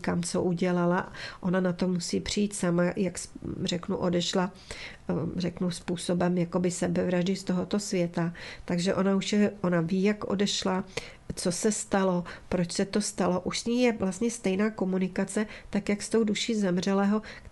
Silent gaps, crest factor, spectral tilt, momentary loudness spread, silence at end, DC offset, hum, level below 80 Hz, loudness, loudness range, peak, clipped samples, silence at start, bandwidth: none; 16 dB; -5 dB/octave; 7 LU; 0.05 s; under 0.1%; none; -54 dBFS; -28 LUFS; 2 LU; -12 dBFS; under 0.1%; 0 s; 12 kHz